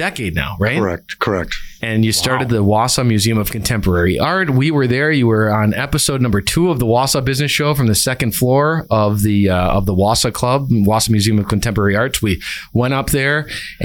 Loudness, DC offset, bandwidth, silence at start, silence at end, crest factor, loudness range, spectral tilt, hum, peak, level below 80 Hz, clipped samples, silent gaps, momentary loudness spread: -15 LUFS; under 0.1%; 19 kHz; 0 s; 0 s; 12 dB; 1 LU; -5 dB/octave; none; -4 dBFS; -34 dBFS; under 0.1%; none; 5 LU